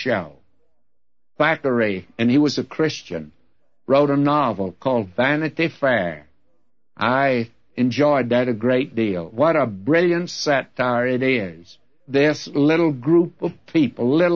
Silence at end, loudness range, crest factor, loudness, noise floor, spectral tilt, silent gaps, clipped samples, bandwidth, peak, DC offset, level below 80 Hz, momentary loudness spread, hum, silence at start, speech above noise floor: 0 s; 2 LU; 16 dB; -20 LUFS; -81 dBFS; -6.5 dB/octave; none; under 0.1%; 7.2 kHz; -4 dBFS; 0.2%; -62 dBFS; 7 LU; none; 0 s; 62 dB